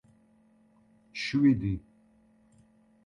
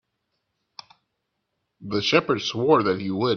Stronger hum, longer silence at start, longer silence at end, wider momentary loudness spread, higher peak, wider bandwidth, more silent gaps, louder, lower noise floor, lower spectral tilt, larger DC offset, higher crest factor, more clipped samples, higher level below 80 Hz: neither; second, 1.15 s vs 1.8 s; first, 1.25 s vs 0 s; first, 15 LU vs 8 LU; second, -14 dBFS vs -4 dBFS; about the same, 7.2 kHz vs 7 kHz; neither; second, -28 LUFS vs -22 LUFS; second, -64 dBFS vs -78 dBFS; first, -6.5 dB/octave vs -5 dB/octave; neither; about the same, 20 dB vs 22 dB; neither; first, -54 dBFS vs -64 dBFS